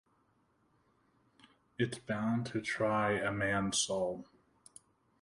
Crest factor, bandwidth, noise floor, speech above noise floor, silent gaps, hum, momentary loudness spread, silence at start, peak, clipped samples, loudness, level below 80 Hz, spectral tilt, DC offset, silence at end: 18 dB; 11.5 kHz; -73 dBFS; 39 dB; none; none; 7 LU; 1.8 s; -20 dBFS; under 0.1%; -34 LUFS; -66 dBFS; -4 dB/octave; under 0.1%; 1 s